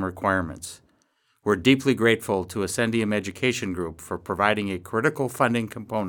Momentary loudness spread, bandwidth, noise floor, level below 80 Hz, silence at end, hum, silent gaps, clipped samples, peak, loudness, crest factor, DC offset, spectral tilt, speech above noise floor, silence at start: 12 LU; 19 kHz; -68 dBFS; -56 dBFS; 0 s; none; none; under 0.1%; -4 dBFS; -24 LUFS; 22 dB; under 0.1%; -5 dB/octave; 43 dB; 0 s